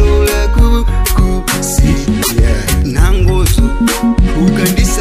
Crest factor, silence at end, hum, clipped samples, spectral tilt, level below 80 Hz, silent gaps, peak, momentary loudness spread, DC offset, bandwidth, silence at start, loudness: 10 dB; 0 s; none; 0.2%; -5 dB/octave; -12 dBFS; none; 0 dBFS; 2 LU; under 0.1%; 16 kHz; 0 s; -12 LUFS